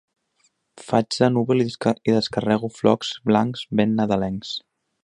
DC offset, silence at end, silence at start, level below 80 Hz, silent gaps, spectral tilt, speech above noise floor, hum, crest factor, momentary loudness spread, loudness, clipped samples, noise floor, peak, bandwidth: under 0.1%; 0.45 s; 0.75 s; -56 dBFS; none; -6 dB/octave; 46 dB; none; 20 dB; 5 LU; -22 LUFS; under 0.1%; -67 dBFS; -2 dBFS; 10.5 kHz